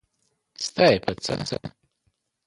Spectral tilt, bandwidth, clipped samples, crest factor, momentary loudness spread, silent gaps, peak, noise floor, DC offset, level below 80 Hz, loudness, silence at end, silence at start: -4.5 dB/octave; 11.5 kHz; under 0.1%; 22 dB; 14 LU; none; -4 dBFS; -73 dBFS; under 0.1%; -54 dBFS; -24 LUFS; 0.8 s; 0.6 s